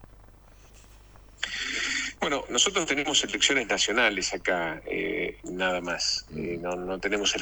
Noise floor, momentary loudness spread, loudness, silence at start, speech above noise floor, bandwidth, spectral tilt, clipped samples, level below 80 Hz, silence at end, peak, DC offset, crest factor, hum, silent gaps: -52 dBFS; 10 LU; -26 LUFS; 0 s; 25 dB; 20 kHz; -1.5 dB/octave; under 0.1%; -52 dBFS; 0 s; -8 dBFS; under 0.1%; 22 dB; none; none